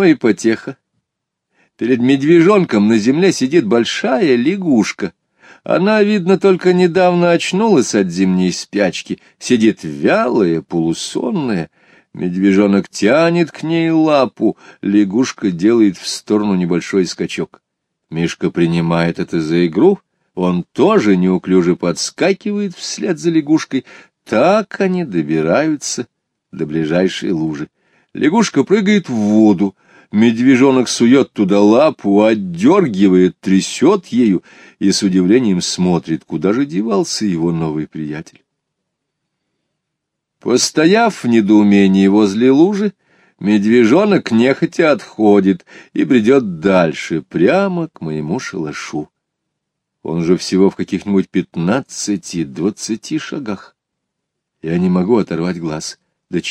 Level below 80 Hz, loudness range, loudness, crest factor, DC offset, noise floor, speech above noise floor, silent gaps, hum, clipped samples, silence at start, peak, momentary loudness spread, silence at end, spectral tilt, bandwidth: -56 dBFS; 7 LU; -14 LUFS; 14 dB; under 0.1%; -77 dBFS; 64 dB; none; none; under 0.1%; 0 s; 0 dBFS; 12 LU; 0 s; -5.5 dB/octave; 11 kHz